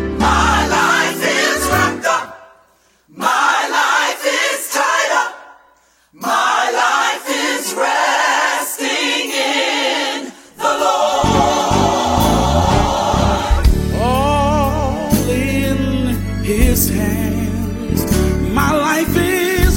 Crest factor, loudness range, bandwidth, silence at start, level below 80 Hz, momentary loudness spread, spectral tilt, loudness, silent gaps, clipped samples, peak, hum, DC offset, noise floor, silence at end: 16 dB; 2 LU; 16.5 kHz; 0 s; -24 dBFS; 5 LU; -4 dB/octave; -15 LUFS; none; under 0.1%; 0 dBFS; none; under 0.1%; -54 dBFS; 0 s